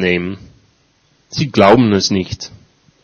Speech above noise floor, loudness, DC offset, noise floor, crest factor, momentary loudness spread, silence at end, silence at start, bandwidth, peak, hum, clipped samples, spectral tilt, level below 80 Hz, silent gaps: 43 dB; -13 LUFS; under 0.1%; -57 dBFS; 16 dB; 19 LU; 0.55 s; 0 s; 8.8 kHz; 0 dBFS; none; 0.2%; -5.5 dB/octave; -46 dBFS; none